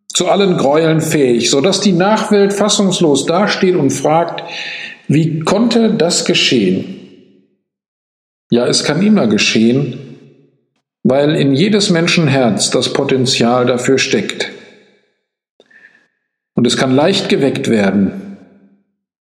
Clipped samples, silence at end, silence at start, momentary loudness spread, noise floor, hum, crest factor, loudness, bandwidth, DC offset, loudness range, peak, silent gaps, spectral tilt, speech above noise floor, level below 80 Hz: under 0.1%; 0.95 s; 0.1 s; 9 LU; -69 dBFS; none; 14 dB; -13 LUFS; 15 kHz; under 0.1%; 4 LU; 0 dBFS; 7.88-8.50 s, 15.49-15.60 s; -4.5 dB/octave; 56 dB; -56 dBFS